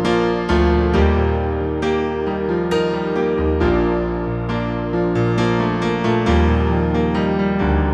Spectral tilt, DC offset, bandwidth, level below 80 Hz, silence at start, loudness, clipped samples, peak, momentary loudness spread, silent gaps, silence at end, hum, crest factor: -7.5 dB/octave; under 0.1%; 8.6 kHz; -26 dBFS; 0 s; -18 LUFS; under 0.1%; -4 dBFS; 6 LU; none; 0 s; none; 14 dB